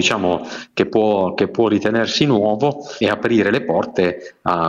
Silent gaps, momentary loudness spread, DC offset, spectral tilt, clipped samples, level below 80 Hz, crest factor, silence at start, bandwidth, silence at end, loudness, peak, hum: none; 6 LU; under 0.1%; -5 dB/octave; under 0.1%; -54 dBFS; 16 dB; 0 s; 9.2 kHz; 0 s; -18 LUFS; -2 dBFS; none